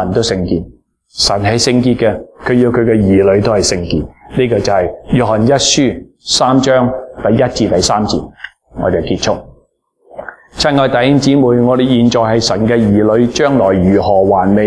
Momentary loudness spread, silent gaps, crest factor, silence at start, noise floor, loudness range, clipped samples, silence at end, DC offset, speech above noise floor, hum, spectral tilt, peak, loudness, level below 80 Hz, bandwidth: 10 LU; none; 12 dB; 0 s; -54 dBFS; 5 LU; under 0.1%; 0 s; under 0.1%; 43 dB; none; -5 dB/octave; 0 dBFS; -12 LUFS; -36 dBFS; 11 kHz